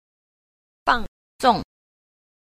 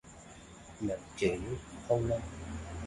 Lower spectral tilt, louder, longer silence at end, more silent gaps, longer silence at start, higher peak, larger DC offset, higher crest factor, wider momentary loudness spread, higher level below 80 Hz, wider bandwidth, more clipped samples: second, -4 dB/octave vs -6 dB/octave; first, -22 LUFS vs -36 LUFS; first, 0.9 s vs 0 s; first, 1.08-1.39 s vs none; first, 0.85 s vs 0.05 s; first, -4 dBFS vs -16 dBFS; neither; about the same, 22 dB vs 20 dB; about the same, 20 LU vs 20 LU; first, -44 dBFS vs -50 dBFS; first, 15 kHz vs 11.5 kHz; neither